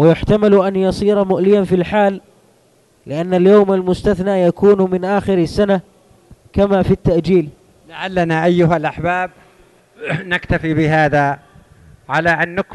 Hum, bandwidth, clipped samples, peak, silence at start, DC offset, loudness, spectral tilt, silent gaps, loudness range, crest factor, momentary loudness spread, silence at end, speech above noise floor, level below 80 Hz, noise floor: none; 11.5 kHz; under 0.1%; -2 dBFS; 0 s; under 0.1%; -15 LUFS; -7.5 dB/octave; none; 4 LU; 14 dB; 11 LU; 0 s; 40 dB; -38 dBFS; -54 dBFS